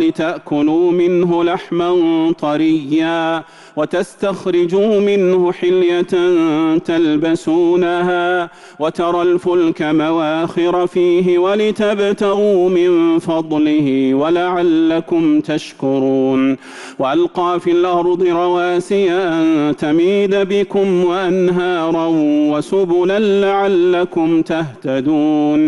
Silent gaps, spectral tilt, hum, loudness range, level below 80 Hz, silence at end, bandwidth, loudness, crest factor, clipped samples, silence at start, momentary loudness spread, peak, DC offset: none; -6.5 dB/octave; none; 2 LU; -54 dBFS; 0 s; 11 kHz; -15 LUFS; 8 dB; under 0.1%; 0 s; 5 LU; -6 dBFS; under 0.1%